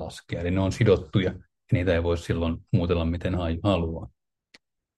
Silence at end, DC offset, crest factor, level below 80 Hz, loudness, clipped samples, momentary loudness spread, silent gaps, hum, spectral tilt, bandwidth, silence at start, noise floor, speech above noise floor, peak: 0.9 s; under 0.1%; 18 dB; -44 dBFS; -26 LUFS; under 0.1%; 10 LU; none; none; -7.5 dB/octave; 11.5 kHz; 0 s; -60 dBFS; 36 dB; -8 dBFS